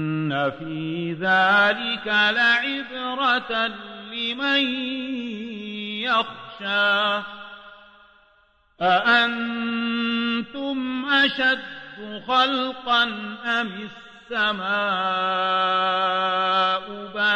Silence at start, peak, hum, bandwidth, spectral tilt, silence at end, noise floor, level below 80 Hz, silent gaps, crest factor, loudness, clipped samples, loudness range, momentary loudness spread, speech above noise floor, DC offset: 0 s; -8 dBFS; none; 9.6 kHz; -5 dB/octave; 0 s; -60 dBFS; -64 dBFS; none; 16 dB; -22 LUFS; under 0.1%; 4 LU; 13 LU; 38 dB; under 0.1%